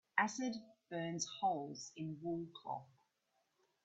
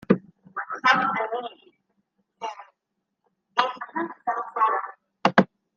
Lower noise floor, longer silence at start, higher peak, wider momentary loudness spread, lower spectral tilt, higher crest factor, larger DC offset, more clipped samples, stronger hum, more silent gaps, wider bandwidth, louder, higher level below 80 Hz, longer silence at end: about the same, -83 dBFS vs -80 dBFS; about the same, 0.15 s vs 0.1 s; second, -16 dBFS vs -2 dBFS; second, 11 LU vs 16 LU; second, -4 dB/octave vs -5.5 dB/octave; about the same, 26 dB vs 26 dB; neither; neither; neither; neither; first, 8.2 kHz vs 7.4 kHz; second, -42 LUFS vs -24 LUFS; second, -84 dBFS vs -70 dBFS; first, 1 s vs 0.3 s